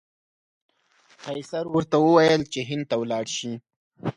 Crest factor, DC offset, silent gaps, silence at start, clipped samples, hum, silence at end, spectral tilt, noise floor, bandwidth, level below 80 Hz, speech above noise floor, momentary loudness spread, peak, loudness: 20 dB; under 0.1%; 3.76-3.91 s; 1.25 s; under 0.1%; none; 0.05 s; -5 dB/octave; -60 dBFS; 11 kHz; -62 dBFS; 38 dB; 17 LU; -4 dBFS; -23 LUFS